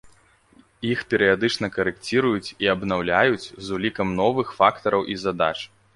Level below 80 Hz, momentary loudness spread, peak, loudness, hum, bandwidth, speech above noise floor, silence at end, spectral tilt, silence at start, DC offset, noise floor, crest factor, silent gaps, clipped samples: -52 dBFS; 7 LU; -2 dBFS; -22 LUFS; none; 11.5 kHz; 34 dB; 0.3 s; -5.5 dB/octave; 0.05 s; under 0.1%; -56 dBFS; 20 dB; none; under 0.1%